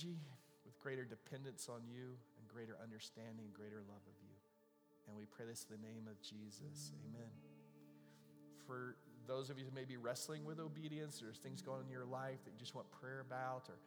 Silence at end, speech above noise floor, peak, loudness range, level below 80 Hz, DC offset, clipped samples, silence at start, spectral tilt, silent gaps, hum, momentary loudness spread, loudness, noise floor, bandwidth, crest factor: 0 s; 24 dB; -32 dBFS; 7 LU; under -90 dBFS; under 0.1%; under 0.1%; 0 s; -4.5 dB/octave; none; none; 17 LU; -52 LUFS; -76 dBFS; over 20 kHz; 22 dB